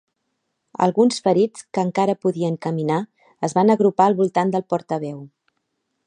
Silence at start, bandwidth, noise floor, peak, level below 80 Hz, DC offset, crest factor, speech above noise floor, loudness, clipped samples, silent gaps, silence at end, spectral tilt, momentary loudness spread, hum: 0.8 s; 10 kHz; -75 dBFS; -2 dBFS; -72 dBFS; under 0.1%; 18 dB; 55 dB; -20 LUFS; under 0.1%; none; 0.8 s; -6.5 dB/octave; 11 LU; none